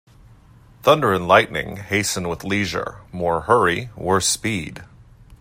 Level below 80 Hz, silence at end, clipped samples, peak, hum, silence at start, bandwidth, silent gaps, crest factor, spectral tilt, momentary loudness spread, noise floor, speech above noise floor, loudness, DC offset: -48 dBFS; 0.05 s; under 0.1%; 0 dBFS; none; 0.85 s; 16 kHz; none; 22 dB; -3.5 dB/octave; 12 LU; -48 dBFS; 28 dB; -20 LUFS; under 0.1%